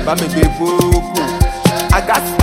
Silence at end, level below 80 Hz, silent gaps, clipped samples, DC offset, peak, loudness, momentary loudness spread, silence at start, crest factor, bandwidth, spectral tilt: 0 s; -20 dBFS; none; under 0.1%; under 0.1%; 0 dBFS; -14 LUFS; 3 LU; 0 s; 14 dB; 17 kHz; -5 dB/octave